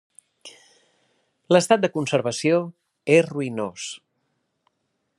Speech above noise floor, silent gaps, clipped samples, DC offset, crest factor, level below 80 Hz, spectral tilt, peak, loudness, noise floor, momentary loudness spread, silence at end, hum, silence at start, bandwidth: 54 dB; none; under 0.1%; under 0.1%; 22 dB; -74 dBFS; -5 dB/octave; -2 dBFS; -21 LUFS; -75 dBFS; 16 LU; 1.2 s; none; 0.45 s; 12.5 kHz